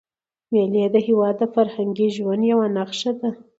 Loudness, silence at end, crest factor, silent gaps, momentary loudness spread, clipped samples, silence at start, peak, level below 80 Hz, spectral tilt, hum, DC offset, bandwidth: -20 LUFS; 0.25 s; 16 dB; none; 5 LU; under 0.1%; 0.5 s; -6 dBFS; -70 dBFS; -6.5 dB/octave; none; under 0.1%; 8 kHz